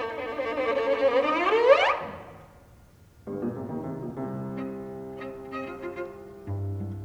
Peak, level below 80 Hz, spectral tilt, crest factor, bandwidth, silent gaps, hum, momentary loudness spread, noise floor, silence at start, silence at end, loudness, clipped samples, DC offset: -6 dBFS; -58 dBFS; -6.5 dB/octave; 22 dB; 9.2 kHz; none; none; 18 LU; -54 dBFS; 0 s; 0 s; -27 LUFS; under 0.1%; under 0.1%